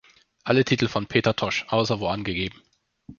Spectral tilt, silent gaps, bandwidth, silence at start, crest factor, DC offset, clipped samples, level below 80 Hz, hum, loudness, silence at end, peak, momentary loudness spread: -5.5 dB/octave; none; 7.2 kHz; 0.45 s; 22 dB; under 0.1%; under 0.1%; -52 dBFS; none; -24 LUFS; 0.05 s; -4 dBFS; 8 LU